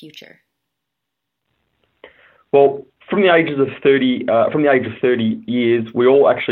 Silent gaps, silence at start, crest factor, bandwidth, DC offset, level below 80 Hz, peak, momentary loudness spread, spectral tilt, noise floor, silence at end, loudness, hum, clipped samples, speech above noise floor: none; 0 s; 16 dB; 4.3 kHz; under 0.1%; -62 dBFS; -2 dBFS; 6 LU; -8.5 dB/octave; -79 dBFS; 0 s; -15 LUFS; none; under 0.1%; 64 dB